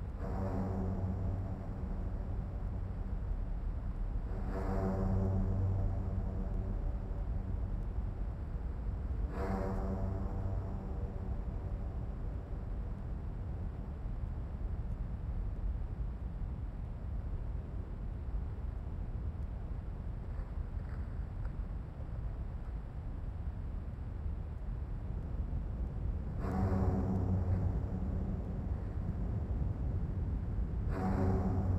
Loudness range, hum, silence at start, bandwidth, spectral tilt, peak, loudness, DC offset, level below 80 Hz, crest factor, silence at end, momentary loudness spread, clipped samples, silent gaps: 7 LU; none; 0 s; 5.8 kHz; -10 dB/octave; -22 dBFS; -39 LUFS; under 0.1%; -40 dBFS; 16 dB; 0 s; 9 LU; under 0.1%; none